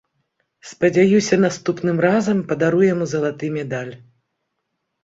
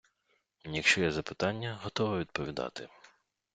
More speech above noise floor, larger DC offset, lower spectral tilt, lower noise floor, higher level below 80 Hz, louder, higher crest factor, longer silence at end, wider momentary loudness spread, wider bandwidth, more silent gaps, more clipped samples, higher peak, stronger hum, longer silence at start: first, 57 dB vs 44 dB; neither; first, -6 dB/octave vs -4 dB/octave; about the same, -75 dBFS vs -76 dBFS; about the same, -60 dBFS vs -62 dBFS; first, -18 LUFS vs -32 LUFS; second, 16 dB vs 24 dB; first, 1.05 s vs 0.5 s; second, 11 LU vs 17 LU; second, 7.8 kHz vs 9.4 kHz; neither; neither; first, -2 dBFS vs -10 dBFS; neither; about the same, 0.65 s vs 0.65 s